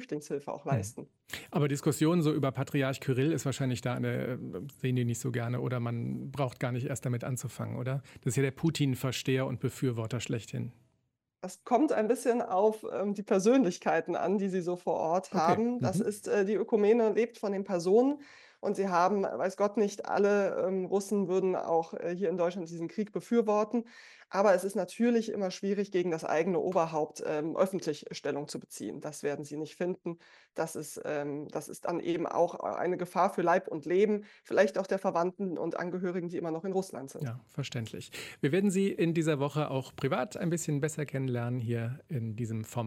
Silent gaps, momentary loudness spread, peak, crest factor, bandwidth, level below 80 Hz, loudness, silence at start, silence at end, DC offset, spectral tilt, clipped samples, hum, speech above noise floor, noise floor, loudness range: none; 11 LU; -12 dBFS; 18 dB; 16 kHz; -72 dBFS; -31 LUFS; 0 s; 0 s; under 0.1%; -6.5 dB/octave; under 0.1%; none; 48 dB; -79 dBFS; 6 LU